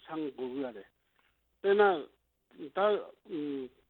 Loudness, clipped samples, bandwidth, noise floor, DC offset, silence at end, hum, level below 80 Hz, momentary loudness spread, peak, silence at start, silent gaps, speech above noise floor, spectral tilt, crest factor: -32 LUFS; under 0.1%; 4.3 kHz; -73 dBFS; under 0.1%; 0.2 s; none; -78 dBFS; 18 LU; -14 dBFS; 0.1 s; none; 41 dB; -8 dB/octave; 20 dB